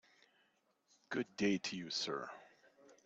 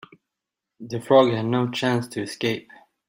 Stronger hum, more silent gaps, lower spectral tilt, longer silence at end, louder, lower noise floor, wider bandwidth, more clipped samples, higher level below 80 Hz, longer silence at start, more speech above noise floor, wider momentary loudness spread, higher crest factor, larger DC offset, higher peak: neither; neither; second, -4 dB/octave vs -6 dB/octave; second, 0.1 s vs 0.5 s; second, -40 LUFS vs -22 LUFS; second, -78 dBFS vs -85 dBFS; second, 8.2 kHz vs 16 kHz; neither; second, -80 dBFS vs -66 dBFS; first, 1.1 s vs 0.8 s; second, 38 dB vs 63 dB; second, 12 LU vs 15 LU; about the same, 20 dB vs 20 dB; neither; second, -24 dBFS vs -4 dBFS